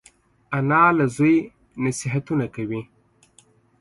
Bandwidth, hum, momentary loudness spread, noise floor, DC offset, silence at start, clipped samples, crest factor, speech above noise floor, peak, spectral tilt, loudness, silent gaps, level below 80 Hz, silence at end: 11.5 kHz; none; 13 LU; -57 dBFS; under 0.1%; 0.5 s; under 0.1%; 20 dB; 37 dB; -4 dBFS; -6.5 dB/octave; -21 LUFS; none; -58 dBFS; 0.95 s